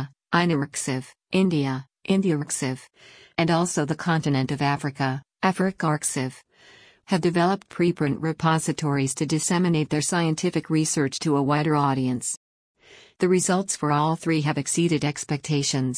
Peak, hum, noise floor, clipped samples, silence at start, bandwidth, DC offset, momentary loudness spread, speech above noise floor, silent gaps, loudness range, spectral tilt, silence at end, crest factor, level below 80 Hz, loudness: -8 dBFS; none; -53 dBFS; under 0.1%; 0 s; 10.5 kHz; under 0.1%; 6 LU; 29 dB; 12.37-12.75 s; 2 LU; -5 dB/octave; 0 s; 16 dB; -62 dBFS; -24 LUFS